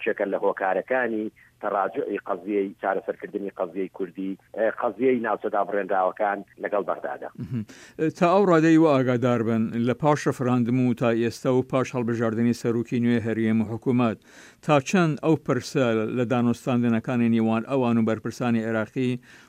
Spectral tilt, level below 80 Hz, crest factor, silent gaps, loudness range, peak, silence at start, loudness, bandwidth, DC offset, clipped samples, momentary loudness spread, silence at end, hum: -7 dB/octave; -66 dBFS; 16 dB; none; 6 LU; -8 dBFS; 0 s; -24 LUFS; 11.5 kHz; under 0.1%; under 0.1%; 10 LU; 0.15 s; none